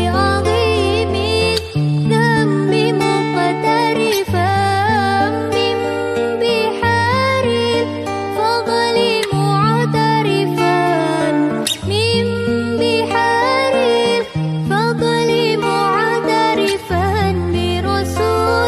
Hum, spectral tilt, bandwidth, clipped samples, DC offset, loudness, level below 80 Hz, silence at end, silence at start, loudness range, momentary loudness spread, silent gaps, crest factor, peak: none; -5.5 dB/octave; 13.5 kHz; under 0.1%; under 0.1%; -16 LUFS; -40 dBFS; 0 s; 0 s; 1 LU; 4 LU; none; 12 dB; -2 dBFS